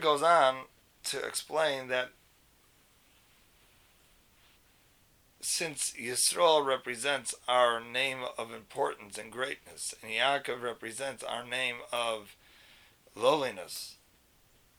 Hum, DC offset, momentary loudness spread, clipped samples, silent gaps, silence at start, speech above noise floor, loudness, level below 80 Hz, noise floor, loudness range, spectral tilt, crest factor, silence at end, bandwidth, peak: none; under 0.1%; 15 LU; under 0.1%; none; 0 s; 34 dB; -31 LUFS; -72 dBFS; -65 dBFS; 9 LU; -1.5 dB/octave; 22 dB; 0.85 s; over 20 kHz; -10 dBFS